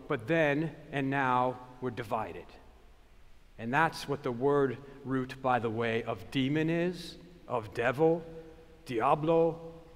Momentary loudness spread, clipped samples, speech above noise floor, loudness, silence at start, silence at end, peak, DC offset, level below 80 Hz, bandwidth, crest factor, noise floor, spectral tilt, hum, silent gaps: 15 LU; under 0.1%; 25 dB; -31 LUFS; 0 s; 0 s; -12 dBFS; under 0.1%; -58 dBFS; 15.5 kHz; 20 dB; -56 dBFS; -7 dB/octave; none; none